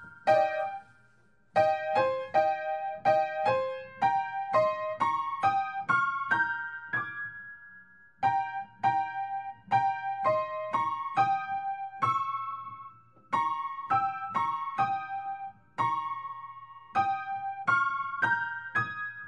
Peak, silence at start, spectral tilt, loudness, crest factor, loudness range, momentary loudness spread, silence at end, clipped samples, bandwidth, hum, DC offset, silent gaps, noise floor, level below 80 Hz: -12 dBFS; 0 s; -5.5 dB/octave; -30 LUFS; 18 dB; 4 LU; 11 LU; 0 s; under 0.1%; 9.8 kHz; none; under 0.1%; none; -66 dBFS; -74 dBFS